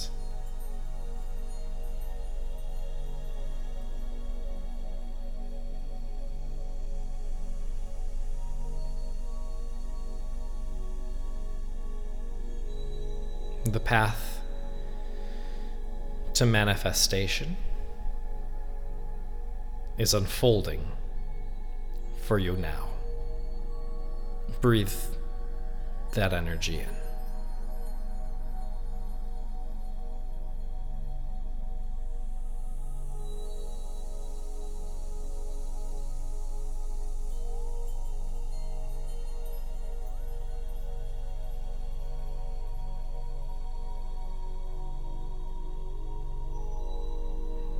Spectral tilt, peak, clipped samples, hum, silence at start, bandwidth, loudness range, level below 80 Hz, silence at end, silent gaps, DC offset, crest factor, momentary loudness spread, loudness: -4.5 dB/octave; -8 dBFS; under 0.1%; none; 0 s; 16.5 kHz; 13 LU; -30 dBFS; 0 s; none; under 0.1%; 20 dB; 15 LU; -35 LUFS